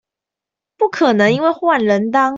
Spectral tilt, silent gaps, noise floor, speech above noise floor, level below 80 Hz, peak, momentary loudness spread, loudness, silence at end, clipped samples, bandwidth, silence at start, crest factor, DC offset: -6 dB/octave; none; -85 dBFS; 71 dB; -60 dBFS; -2 dBFS; 5 LU; -15 LUFS; 0 s; under 0.1%; 7.8 kHz; 0.8 s; 14 dB; under 0.1%